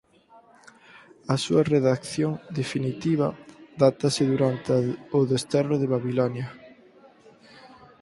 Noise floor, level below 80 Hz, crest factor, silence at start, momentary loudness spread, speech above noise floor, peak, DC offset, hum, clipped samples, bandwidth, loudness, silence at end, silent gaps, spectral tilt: -55 dBFS; -62 dBFS; 22 dB; 0.95 s; 8 LU; 32 dB; -4 dBFS; under 0.1%; none; under 0.1%; 11.5 kHz; -25 LUFS; 0.35 s; none; -6.5 dB/octave